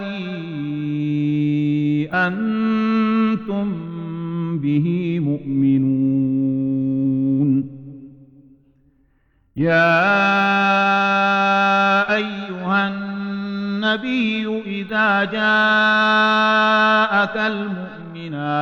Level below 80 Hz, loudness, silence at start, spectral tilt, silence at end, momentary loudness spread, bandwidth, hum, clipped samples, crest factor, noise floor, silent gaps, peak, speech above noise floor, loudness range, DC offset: -58 dBFS; -18 LUFS; 0 s; -7 dB/octave; 0 s; 12 LU; 7 kHz; none; under 0.1%; 14 dB; -60 dBFS; none; -6 dBFS; 43 dB; 5 LU; under 0.1%